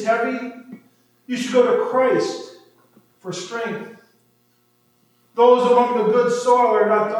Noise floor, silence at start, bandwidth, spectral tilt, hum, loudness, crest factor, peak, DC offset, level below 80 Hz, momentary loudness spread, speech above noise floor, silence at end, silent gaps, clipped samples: -62 dBFS; 0 s; 11 kHz; -5 dB/octave; none; -18 LUFS; 18 dB; -2 dBFS; under 0.1%; -84 dBFS; 18 LU; 44 dB; 0 s; none; under 0.1%